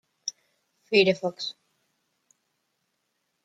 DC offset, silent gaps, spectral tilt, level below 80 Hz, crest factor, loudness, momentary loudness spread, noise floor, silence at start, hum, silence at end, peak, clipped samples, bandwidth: under 0.1%; none; -4 dB/octave; -76 dBFS; 24 dB; -26 LUFS; 15 LU; -77 dBFS; 0.25 s; none; 1.95 s; -8 dBFS; under 0.1%; 9 kHz